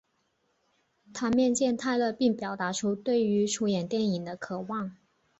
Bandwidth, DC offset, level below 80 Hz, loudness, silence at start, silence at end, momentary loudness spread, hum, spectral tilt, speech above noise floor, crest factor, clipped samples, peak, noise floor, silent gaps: 8.2 kHz; under 0.1%; -68 dBFS; -28 LUFS; 1.15 s; 0.45 s; 10 LU; none; -5 dB/octave; 46 dB; 16 dB; under 0.1%; -14 dBFS; -74 dBFS; none